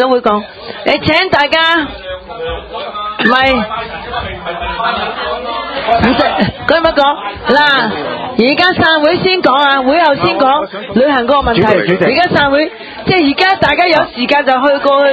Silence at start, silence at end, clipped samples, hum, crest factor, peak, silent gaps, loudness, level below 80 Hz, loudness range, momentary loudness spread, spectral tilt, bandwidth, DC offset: 0 s; 0 s; 0.2%; none; 12 dB; 0 dBFS; none; -11 LUFS; -36 dBFS; 5 LU; 11 LU; -6.5 dB/octave; 8 kHz; under 0.1%